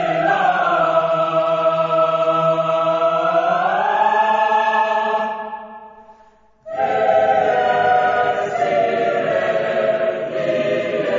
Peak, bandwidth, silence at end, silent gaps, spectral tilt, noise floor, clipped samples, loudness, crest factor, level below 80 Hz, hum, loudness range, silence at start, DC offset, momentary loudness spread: -4 dBFS; 7.6 kHz; 0 s; none; -5.5 dB/octave; -51 dBFS; under 0.1%; -17 LUFS; 14 dB; -64 dBFS; none; 3 LU; 0 s; under 0.1%; 5 LU